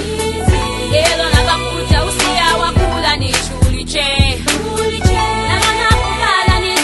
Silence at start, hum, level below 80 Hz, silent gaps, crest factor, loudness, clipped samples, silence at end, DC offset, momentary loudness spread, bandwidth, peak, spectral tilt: 0 s; none; -22 dBFS; none; 14 dB; -14 LUFS; under 0.1%; 0 s; under 0.1%; 4 LU; 12.5 kHz; 0 dBFS; -4 dB/octave